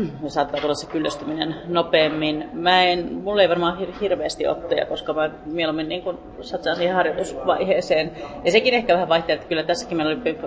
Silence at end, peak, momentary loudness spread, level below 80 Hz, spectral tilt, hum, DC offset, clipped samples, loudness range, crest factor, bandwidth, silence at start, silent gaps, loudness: 0 s; -2 dBFS; 8 LU; -50 dBFS; -4.5 dB/octave; none; under 0.1%; under 0.1%; 4 LU; 20 dB; 8 kHz; 0 s; none; -21 LUFS